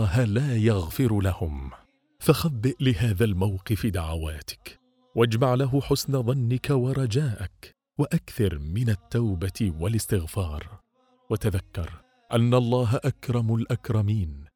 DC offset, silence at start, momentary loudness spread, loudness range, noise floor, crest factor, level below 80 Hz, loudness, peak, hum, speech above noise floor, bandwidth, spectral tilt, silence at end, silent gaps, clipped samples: under 0.1%; 0 s; 12 LU; 3 LU; -64 dBFS; 20 dB; -42 dBFS; -26 LUFS; -4 dBFS; none; 40 dB; 18.5 kHz; -7 dB/octave; 0.1 s; none; under 0.1%